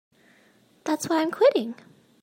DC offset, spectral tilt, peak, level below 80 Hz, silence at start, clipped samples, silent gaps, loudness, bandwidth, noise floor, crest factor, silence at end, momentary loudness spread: under 0.1%; -4 dB/octave; -8 dBFS; -78 dBFS; 0.85 s; under 0.1%; none; -23 LUFS; 16 kHz; -60 dBFS; 18 dB; 0.5 s; 16 LU